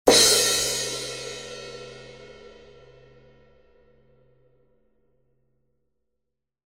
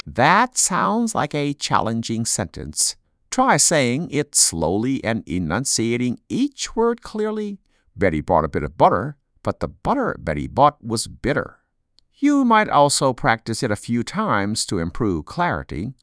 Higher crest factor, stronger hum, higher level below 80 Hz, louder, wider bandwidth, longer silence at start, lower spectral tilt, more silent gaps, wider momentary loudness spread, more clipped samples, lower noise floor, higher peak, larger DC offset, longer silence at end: first, 26 dB vs 20 dB; neither; second, -56 dBFS vs -44 dBFS; about the same, -20 LUFS vs -20 LUFS; first, 17 kHz vs 11 kHz; about the same, 0.05 s vs 0.05 s; second, -0.5 dB/octave vs -3.5 dB/octave; neither; first, 29 LU vs 10 LU; neither; first, -83 dBFS vs -63 dBFS; about the same, -2 dBFS vs -2 dBFS; neither; first, 4.2 s vs 0.1 s